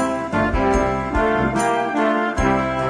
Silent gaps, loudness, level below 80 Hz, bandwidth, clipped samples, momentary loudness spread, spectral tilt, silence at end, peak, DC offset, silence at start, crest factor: none; -19 LUFS; -30 dBFS; 11 kHz; under 0.1%; 2 LU; -6 dB/octave; 0 s; -6 dBFS; under 0.1%; 0 s; 12 dB